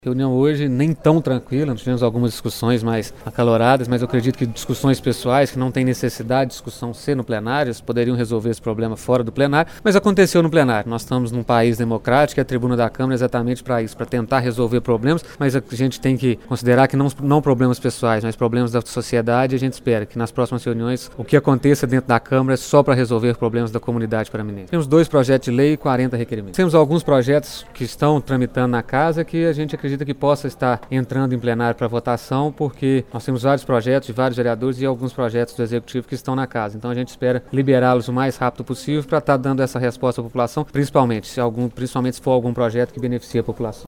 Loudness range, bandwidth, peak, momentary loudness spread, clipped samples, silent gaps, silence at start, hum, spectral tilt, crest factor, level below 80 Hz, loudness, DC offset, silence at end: 3 LU; 16.5 kHz; 0 dBFS; 8 LU; under 0.1%; none; 0.05 s; none; -7 dB/octave; 18 dB; -46 dBFS; -19 LUFS; under 0.1%; 0 s